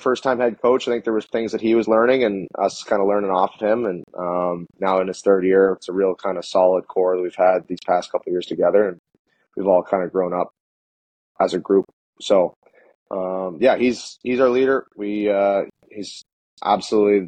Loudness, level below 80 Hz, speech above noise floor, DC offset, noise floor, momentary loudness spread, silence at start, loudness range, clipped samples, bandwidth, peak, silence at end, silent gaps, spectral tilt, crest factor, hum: -20 LUFS; -62 dBFS; over 71 dB; under 0.1%; under -90 dBFS; 10 LU; 0 s; 3 LU; under 0.1%; 9.4 kHz; -4 dBFS; 0 s; 8.99-9.04 s, 9.19-9.25 s, 10.60-11.35 s, 11.93-12.13 s, 12.56-12.62 s, 12.95-13.06 s, 16.33-16.57 s; -5.5 dB/octave; 16 dB; none